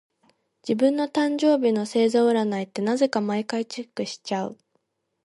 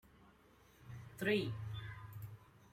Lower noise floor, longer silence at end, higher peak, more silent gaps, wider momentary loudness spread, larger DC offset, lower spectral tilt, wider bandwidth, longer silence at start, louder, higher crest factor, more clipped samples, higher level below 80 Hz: first, -73 dBFS vs -67 dBFS; first, 0.7 s vs 0.05 s; first, -8 dBFS vs -22 dBFS; neither; second, 11 LU vs 20 LU; neither; about the same, -5.5 dB/octave vs -6 dB/octave; second, 11.5 kHz vs 16 kHz; first, 0.65 s vs 0.05 s; first, -24 LUFS vs -42 LUFS; second, 16 dB vs 22 dB; neither; second, -74 dBFS vs -68 dBFS